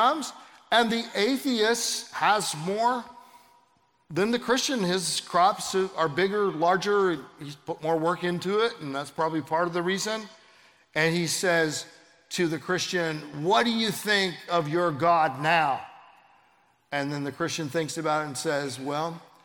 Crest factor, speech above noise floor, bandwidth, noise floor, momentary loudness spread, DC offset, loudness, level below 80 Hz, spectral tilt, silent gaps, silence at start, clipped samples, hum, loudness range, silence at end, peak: 20 dB; 40 dB; 18 kHz; -66 dBFS; 10 LU; under 0.1%; -26 LUFS; -72 dBFS; -3.5 dB/octave; none; 0 s; under 0.1%; none; 3 LU; 0.25 s; -8 dBFS